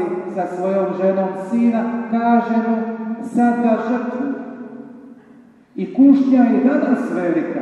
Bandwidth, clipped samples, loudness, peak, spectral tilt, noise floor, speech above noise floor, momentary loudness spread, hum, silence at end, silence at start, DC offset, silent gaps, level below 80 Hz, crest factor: 8.6 kHz; under 0.1%; -17 LUFS; -2 dBFS; -8.5 dB/octave; -46 dBFS; 30 dB; 16 LU; none; 0 s; 0 s; under 0.1%; none; -70 dBFS; 16 dB